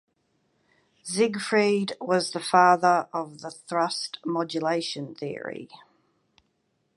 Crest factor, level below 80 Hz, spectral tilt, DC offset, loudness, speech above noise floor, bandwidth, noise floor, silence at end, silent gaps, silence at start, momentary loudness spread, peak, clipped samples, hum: 22 dB; -78 dBFS; -4 dB/octave; under 0.1%; -25 LUFS; 48 dB; 11.5 kHz; -73 dBFS; 1.2 s; none; 1.05 s; 17 LU; -4 dBFS; under 0.1%; none